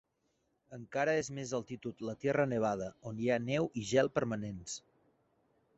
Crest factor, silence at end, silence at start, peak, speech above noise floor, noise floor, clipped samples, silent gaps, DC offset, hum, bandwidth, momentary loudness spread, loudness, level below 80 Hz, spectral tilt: 20 dB; 1 s; 0.7 s; -16 dBFS; 44 dB; -79 dBFS; under 0.1%; none; under 0.1%; none; 8 kHz; 12 LU; -35 LUFS; -68 dBFS; -5 dB/octave